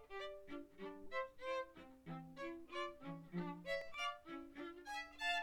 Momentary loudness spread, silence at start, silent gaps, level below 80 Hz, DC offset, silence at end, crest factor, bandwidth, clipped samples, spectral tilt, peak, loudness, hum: 10 LU; 0 s; none; -70 dBFS; under 0.1%; 0 s; 18 dB; 19.5 kHz; under 0.1%; -4.5 dB/octave; -30 dBFS; -48 LUFS; none